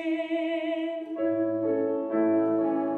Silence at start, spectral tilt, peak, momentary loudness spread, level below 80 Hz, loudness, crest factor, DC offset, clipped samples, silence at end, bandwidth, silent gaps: 0 s; -8 dB/octave; -14 dBFS; 6 LU; -84 dBFS; -27 LUFS; 12 dB; under 0.1%; under 0.1%; 0 s; 4.2 kHz; none